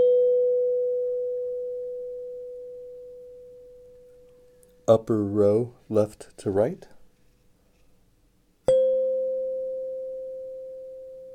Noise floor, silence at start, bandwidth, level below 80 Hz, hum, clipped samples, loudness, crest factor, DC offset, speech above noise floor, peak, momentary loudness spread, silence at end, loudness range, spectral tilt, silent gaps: -63 dBFS; 0 s; 10 kHz; -62 dBFS; none; under 0.1%; -26 LUFS; 20 dB; under 0.1%; 39 dB; -6 dBFS; 20 LU; 0 s; 9 LU; -8 dB/octave; none